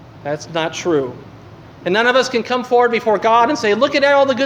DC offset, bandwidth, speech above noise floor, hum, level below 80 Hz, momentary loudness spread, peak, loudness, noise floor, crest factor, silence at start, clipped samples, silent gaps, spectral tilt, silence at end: under 0.1%; 10.5 kHz; 23 dB; none; -56 dBFS; 11 LU; 0 dBFS; -16 LUFS; -38 dBFS; 16 dB; 0.15 s; under 0.1%; none; -4 dB/octave; 0 s